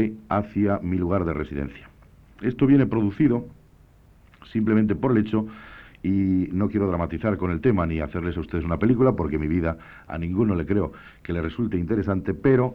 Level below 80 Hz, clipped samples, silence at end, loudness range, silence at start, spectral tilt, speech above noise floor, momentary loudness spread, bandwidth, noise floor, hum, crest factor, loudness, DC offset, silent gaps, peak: -42 dBFS; under 0.1%; 0 s; 2 LU; 0 s; -10.5 dB/octave; 30 dB; 11 LU; 5 kHz; -53 dBFS; none; 16 dB; -24 LUFS; under 0.1%; none; -6 dBFS